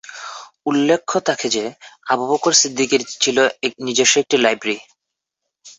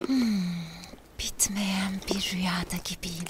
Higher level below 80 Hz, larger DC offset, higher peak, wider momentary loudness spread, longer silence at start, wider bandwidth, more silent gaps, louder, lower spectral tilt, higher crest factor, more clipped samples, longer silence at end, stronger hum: second, -64 dBFS vs -48 dBFS; neither; first, -2 dBFS vs -10 dBFS; first, 15 LU vs 12 LU; about the same, 0.05 s vs 0 s; second, 8.4 kHz vs 16 kHz; neither; first, -17 LUFS vs -29 LUFS; second, -2 dB/octave vs -3.5 dB/octave; about the same, 18 dB vs 20 dB; neither; about the same, 0.05 s vs 0 s; neither